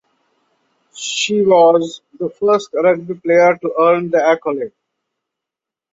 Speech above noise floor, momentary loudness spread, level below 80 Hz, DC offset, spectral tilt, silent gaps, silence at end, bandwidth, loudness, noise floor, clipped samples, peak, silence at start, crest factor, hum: 71 dB; 15 LU; -64 dBFS; under 0.1%; -4 dB/octave; none; 1.25 s; 8 kHz; -15 LUFS; -85 dBFS; under 0.1%; -2 dBFS; 0.95 s; 14 dB; none